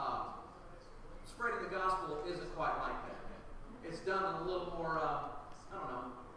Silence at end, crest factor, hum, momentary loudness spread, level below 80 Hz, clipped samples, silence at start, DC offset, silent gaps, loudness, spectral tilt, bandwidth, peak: 0 s; 16 dB; none; 18 LU; -54 dBFS; under 0.1%; 0 s; under 0.1%; none; -40 LUFS; -5.5 dB/octave; 11 kHz; -24 dBFS